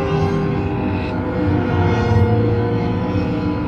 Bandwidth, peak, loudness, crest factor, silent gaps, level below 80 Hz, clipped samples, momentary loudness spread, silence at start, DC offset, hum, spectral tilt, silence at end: 6.8 kHz; -4 dBFS; -18 LUFS; 14 dB; none; -32 dBFS; under 0.1%; 5 LU; 0 s; under 0.1%; none; -9 dB/octave; 0 s